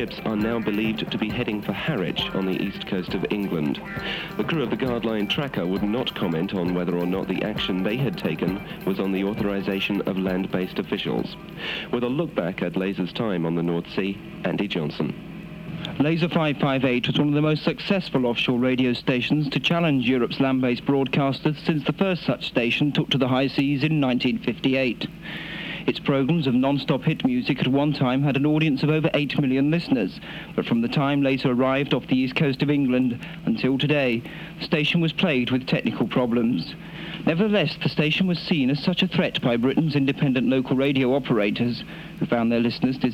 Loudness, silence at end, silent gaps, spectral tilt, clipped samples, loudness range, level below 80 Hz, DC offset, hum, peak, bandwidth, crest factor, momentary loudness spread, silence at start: -23 LUFS; 0 s; none; -7.5 dB/octave; under 0.1%; 4 LU; -50 dBFS; under 0.1%; none; -8 dBFS; 15.5 kHz; 16 dB; 7 LU; 0 s